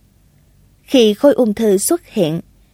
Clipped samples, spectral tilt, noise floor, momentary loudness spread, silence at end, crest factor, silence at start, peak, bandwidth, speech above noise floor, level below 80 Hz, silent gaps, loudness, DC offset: under 0.1%; -4.5 dB/octave; -52 dBFS; 7 LU; 0.3 s; 16 dB; 0.9 s; 0 dBFS; 16.5 kHz; 38 dB; -52 dBFS; none; -14 LUFS; under 0.1%